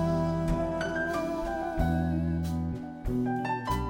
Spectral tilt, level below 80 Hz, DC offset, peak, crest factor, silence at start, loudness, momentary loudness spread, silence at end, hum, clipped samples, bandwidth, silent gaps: -7.5 dB/octave; -40 dBFS; under 0.1%; -14 dBFS; 14 dB; 0 s; -30 LUFS; 5 LU; 0 s; none; under 0.1%; 17 kHz; none